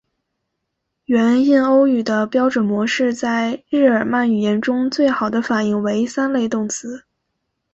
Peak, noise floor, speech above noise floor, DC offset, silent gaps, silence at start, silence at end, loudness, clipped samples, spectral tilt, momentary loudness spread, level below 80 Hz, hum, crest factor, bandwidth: -2 dBFS; -76 dBFS; 59 dB; under 0.1%; none; 1.1 s; 0.75 s; -17 LUFS; under 0.1%; -5 dB/octave; 7 LU; -60 dBFS; none; 14 dB; 8.2 kHz